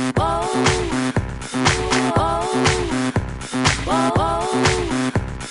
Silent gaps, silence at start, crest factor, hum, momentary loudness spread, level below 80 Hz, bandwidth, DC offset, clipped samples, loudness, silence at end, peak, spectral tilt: none; 0 s; 18 dB; none; 5 LU; -32 dBFS; 11 kHz; under 0.1%; under 0.1%; -20 LUFS; 0 s; -2 dBFS; -4.5 dB/octave